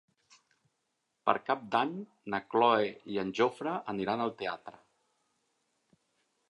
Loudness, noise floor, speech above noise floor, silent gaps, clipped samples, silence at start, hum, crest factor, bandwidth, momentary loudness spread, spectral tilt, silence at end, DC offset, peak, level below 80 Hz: -32 LUFS; -81 dBFS; 50 dB; none; under 0.1%; 1.25 s; none; 26 dB; 11 kHz; 12 LU; -6 dB/octave; 1.8 s; under 0.1%; -8 dBFS; -76 dBFS